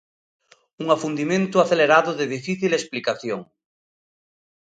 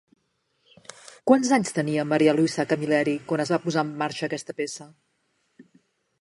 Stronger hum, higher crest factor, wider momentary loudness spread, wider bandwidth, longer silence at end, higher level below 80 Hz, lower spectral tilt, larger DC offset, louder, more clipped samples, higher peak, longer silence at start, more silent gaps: neither; about the same, 22 dB vs 22 dB; about the same, 12 LU vs 13 LU; second, 9.4 kHz vs 11.5 kHz; first, 1.25 s vs 0.6 s; about the same, -70 dBFS vs -72 dBFS; about the same, -5 dB/octave vs -5 dB/octave; neither; first, -21 LUFS vs -24 LUFS; neither; about the same, -2 dBFS vs -4 dBFS; second, 0.8 s vs 1.25 s; neither